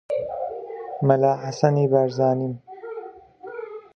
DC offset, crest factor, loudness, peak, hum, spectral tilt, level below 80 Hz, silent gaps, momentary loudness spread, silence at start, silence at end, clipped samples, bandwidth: under 0.1%; 22 dB; -22 LUFS; -2 dBFS; none; -8 dB/octave; -66 dBFS; none; 18 LU; 0.1 s; 0.15 s; under 0.1%; 6.8 kHz